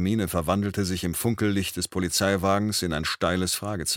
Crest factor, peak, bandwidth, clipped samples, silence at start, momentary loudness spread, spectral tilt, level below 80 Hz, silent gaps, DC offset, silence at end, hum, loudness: 16 dB; -8 dBFS; 17.5 kHz; under 0.1%; 0 s; 4 LU; -4 dB/octave; -46 dBFS; none; under 0.1%; 0 s; none; -25 LUFS